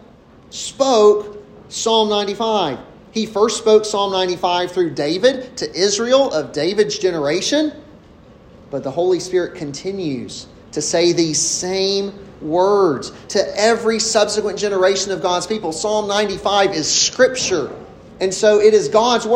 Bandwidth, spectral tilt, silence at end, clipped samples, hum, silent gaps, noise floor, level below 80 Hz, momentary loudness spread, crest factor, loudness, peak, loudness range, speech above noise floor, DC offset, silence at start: 10.5 kHz; -3 dB/octave; 0 s; under 0.1%; none; none; -45 dBFS; -52 dBFS; 12 LU; 16 dB; -17 LUFS; 0 dBFS; 4 LU; 28 dB; under 0.1%; 0.5 s